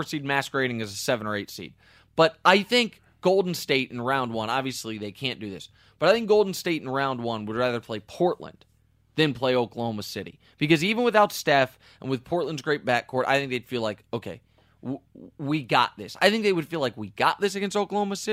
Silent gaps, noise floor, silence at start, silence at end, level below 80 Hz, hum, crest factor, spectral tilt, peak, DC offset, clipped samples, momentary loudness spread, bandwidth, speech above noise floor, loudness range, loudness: none; -53 dBFS; 0 s; 0 s; -64 dBFS; none; 22 dB; -4.5 dB/octave; -4 dBFS; under 0.1%; under 0.1%; 15 LU; 16 kHz; 27 dB; 4 LU; -25 LUFS